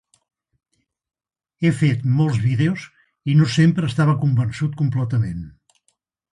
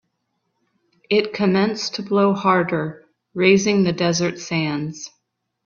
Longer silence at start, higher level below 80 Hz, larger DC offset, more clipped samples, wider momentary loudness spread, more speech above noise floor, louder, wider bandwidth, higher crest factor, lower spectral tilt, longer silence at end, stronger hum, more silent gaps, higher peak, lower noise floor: first, 1.6 s vs 1.1 s; first, -50 dBFS vs -60 dBFS; neither; neither; second, 10 LU vs 14 LU; about the same, 51 dB vs 54 dB; about the same, -19 LUFS vs -19 LUFS; first, 11 kHz vs 7.2 kHz; about the same, 16 dB vs 20 dB; first, -7.5 dB/octave vs -5 dB/octave; first, 0.85 s vs 0.55 s; neither; neither; second, -6 dBFS vs 0 dBFS; second, -69 dBFS vs -73 dBFS